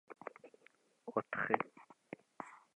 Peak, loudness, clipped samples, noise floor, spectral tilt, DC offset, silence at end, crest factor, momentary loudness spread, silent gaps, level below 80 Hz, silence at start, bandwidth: -14 dBFS; -40 LUFS; under 0.1%; -70 dBFS; -6.5 dB/octave; under 0.1%; 0.2 s; 30 dB; 23 LU; none; -86 dBFS; 0.1 s; 11 kHz